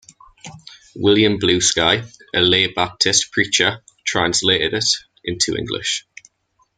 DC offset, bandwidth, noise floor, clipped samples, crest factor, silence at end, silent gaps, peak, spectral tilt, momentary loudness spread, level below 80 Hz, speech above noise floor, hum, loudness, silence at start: under 0.1%; 10 kHz; -64 dBFS; under 0.1%; 18 dB; 0.75 s; none; 0 dBFS; -2.5 dB/octave; 9 LU; -50 dBFS; 46 dB; none; -17 LUFS; 0.45 s